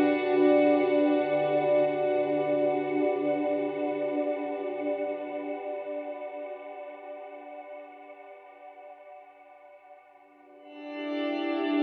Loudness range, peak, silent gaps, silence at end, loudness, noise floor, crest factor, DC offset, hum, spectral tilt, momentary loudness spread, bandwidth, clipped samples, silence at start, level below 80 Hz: 21 LU; -12 dBFS; none; 0 s; -28 LUFS; -56 dBFS; 18 dB; under 0.1%; none; -8.5 dB/octave; 23 LU; 4.8 kHz; under 0.1%; 0 s; -86 dBFS